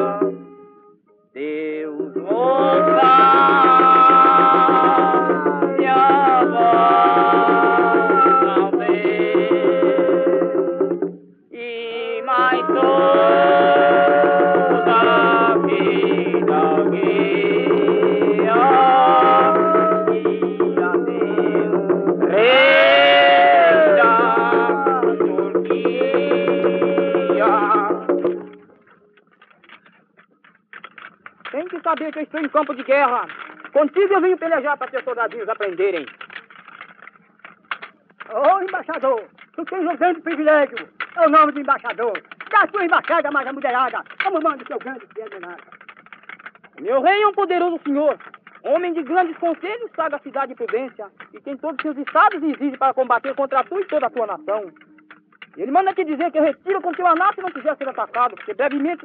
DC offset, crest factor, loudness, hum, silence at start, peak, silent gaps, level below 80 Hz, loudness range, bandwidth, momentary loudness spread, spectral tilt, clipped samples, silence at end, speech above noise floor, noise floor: under 0.1%; 16 dB; -16 LUFS; none; 0 s; -2 dBFS; none; -74 dBFS; 11 LU; 4.9 kHz; 15 LU; -3 dB/octave; under 0.1%; 0.1 s; 36 dB; -55 dBFS